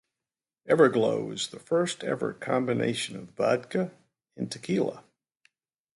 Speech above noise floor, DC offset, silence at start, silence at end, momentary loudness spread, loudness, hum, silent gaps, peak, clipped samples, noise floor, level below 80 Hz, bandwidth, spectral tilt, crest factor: over 63 dB; under 0.1%; 0.65 s; 0.95 s; 13 LU; -28 LUFS; none; none; -6 dBFS; under 0.1%; under -90 dBFS; -72 dBFS; 11.5 kHz; -5 dB/octave; 22 dB